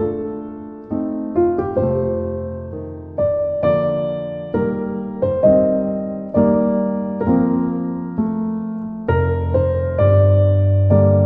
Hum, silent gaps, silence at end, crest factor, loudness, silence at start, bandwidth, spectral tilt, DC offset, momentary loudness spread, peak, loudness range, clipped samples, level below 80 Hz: none; none; 0 s; 16 dB; -18 LUFS; 0 s; 3.8 kHz; -12.5 dB/octave; under 0.1%; 12 LU; -2 dBFS; 4 LU; under 0.1%; -44 dBFS